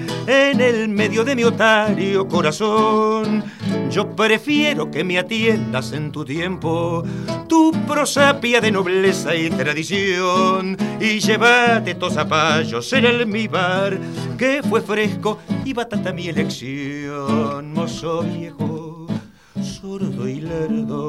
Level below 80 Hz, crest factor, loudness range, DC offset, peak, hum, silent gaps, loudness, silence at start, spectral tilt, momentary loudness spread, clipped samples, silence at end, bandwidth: -54 dBFS; 16 dB; 7 LU; 0.1%; -2 dBFS; none; none; -18 LUFS; 0 s; -5 dB/octave; 11 LU; under 0.1%; 0 s; 14.5 kHz